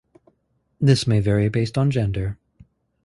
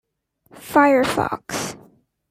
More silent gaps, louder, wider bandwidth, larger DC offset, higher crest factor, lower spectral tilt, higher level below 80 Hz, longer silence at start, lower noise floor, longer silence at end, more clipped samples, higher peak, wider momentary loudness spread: neither; about the same, -21 LUFS vs -19 LUFS; second, 11.5 kHz vs 16 kHz; neither; about the same, 18 dB vs 20 dB; first, -7 dB/octave vs -4 dB/octave; first, -42 dBFS vs -54 dBFS; first, 0.8 s vs 0.55 s; first, -68 dBFS vs -60 dBFS; first, 0.7 s vs 0.55 s; neither; about the same, -2 dBFS vs -2 dBFS; about the same, 10 LU vs 12 LU